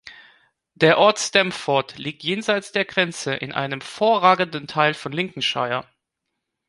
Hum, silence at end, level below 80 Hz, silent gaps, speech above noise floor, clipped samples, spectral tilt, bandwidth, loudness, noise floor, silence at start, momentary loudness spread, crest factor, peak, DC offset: none; 0.85 s; -66 dBFS; none; 59 dB; under 0.1%; -3.5 dB/octave; 11.5 kHz; -21 LUFS; -80 dBFS; 0.05 s; 10 LU; 20 dB; -2 dBFS; under 0.1%